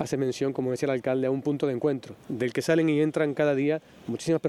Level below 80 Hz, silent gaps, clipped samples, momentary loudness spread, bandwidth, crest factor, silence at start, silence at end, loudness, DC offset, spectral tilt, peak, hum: -66 dBFS; none; under 0.1%; 8 LU; 14 kHz; 16 dB; 0 s; 0 s; -27 LUFS; under 0.1%; -6.5 dB/octave; -10 dBFS; none